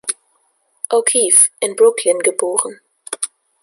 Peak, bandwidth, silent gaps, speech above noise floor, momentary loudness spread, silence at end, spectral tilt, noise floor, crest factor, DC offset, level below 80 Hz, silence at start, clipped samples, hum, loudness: 0 dBFS; 13 kHz; none; 47 dB; 17 LU; 0.35 s; 0 dB/octave; -62 dBFS; 18 dB; under 0.1%; -70 dBFS; 0.05 s; under 0.1%; none; -14 LUFS